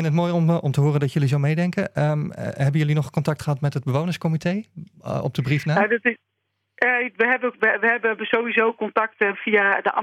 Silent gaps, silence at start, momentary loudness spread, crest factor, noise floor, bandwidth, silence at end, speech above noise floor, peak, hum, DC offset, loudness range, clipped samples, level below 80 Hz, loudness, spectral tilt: none; 0 s; 7 LU; 18 dB; -76 dBFS; 12.5 kHz; 0 s; 54 dB; -4 dBFS; none; under 0.1%; 4 LU; under 0.1%; -62 dBFS; -21 LUFS; -7 dB/octave